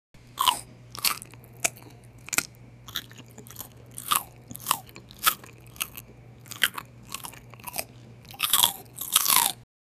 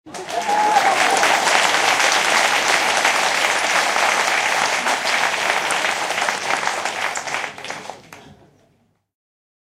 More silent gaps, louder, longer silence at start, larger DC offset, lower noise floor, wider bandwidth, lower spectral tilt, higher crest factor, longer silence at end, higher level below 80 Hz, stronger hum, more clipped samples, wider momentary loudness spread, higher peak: neither; second, -26 LUFS vs -17 LUFS; about the same, 0.15 s vs 0.05 s; neither; second, -48 dBFS vs -62 dBFS; first, over 20 kHz vs 16 kHz; about the same, 0 dB/octave vs 0 dB/octave; first, 30 dB vs 18 dB; second, 0.35 s vs 1.3 s; first, -60 dBFS vs -66 dBFS; neither; neither; first, 23 LU vs 10 LU; about the same, 0 dBFS vs -2 dBFS